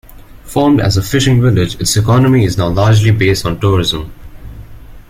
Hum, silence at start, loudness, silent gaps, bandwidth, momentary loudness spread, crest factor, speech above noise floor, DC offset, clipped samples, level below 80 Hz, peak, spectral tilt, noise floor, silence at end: none; 0.15 s; -12 LUFS; none; 16 kHz; 5 LU; 12 dB; 22 dB; under 0.1%; under 0.1%; -30 dBFS; 0 dBFS; -5.5 dB/octave; -33 dBFS; 0.1 s